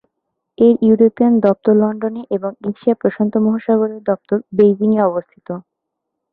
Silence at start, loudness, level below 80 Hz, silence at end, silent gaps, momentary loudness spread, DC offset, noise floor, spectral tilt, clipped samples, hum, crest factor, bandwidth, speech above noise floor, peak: 0.6 s; -15 LUFS; -60 dBFS; 0.75 s; none; 11 LU; under 0.1%; -77 dBFS; -11.5 dB/octave; under 0.1%; none; 14 dB; 4 kHz; 63 dB; -2 dBFS